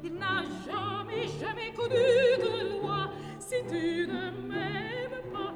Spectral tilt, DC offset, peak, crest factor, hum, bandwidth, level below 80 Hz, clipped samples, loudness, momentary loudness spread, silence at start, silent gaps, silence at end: -5 dB/octave; under 0.1%; -12 dBFS; 18 dB; none; 13 kHz; -60 dBFS; under 0.1%; -31 LUFS; 11 LU; 0 s; none; 0 s